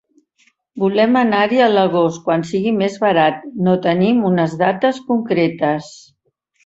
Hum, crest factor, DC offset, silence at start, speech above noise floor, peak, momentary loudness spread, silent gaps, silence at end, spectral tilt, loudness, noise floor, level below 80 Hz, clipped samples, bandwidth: none; 16 dB; under 0.1%; 0.75 s; 48 dB; -2 dBFS; 6 LU; none; 0.7 s; -6.5 dB/octave; -16 LUFS; -64 dBFS; -60 dBFS; under 0.1%; 8 kHz